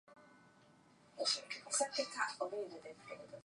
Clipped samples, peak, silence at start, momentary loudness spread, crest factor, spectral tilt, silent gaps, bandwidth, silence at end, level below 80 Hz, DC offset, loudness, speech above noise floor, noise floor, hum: under 0.1%; -22 dBFS; 0.1 s; 16 LU; 20 dB; 0 dB/octave; none; 11 kHz; 0.05 s; -88 dBFS; under 0.1%; -39 LUFS; 25 dB; -67 dBFS; none